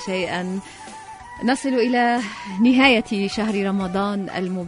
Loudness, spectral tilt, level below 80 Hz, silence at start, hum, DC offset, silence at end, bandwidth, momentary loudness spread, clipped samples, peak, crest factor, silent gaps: -20 LUFS; -5 dB/octave; -52 dBFS; 0 s; none; under 0.1%; 0 s; 11 kHz; 21 LU; under 0.1%; -2 dBFS; 20 dB; none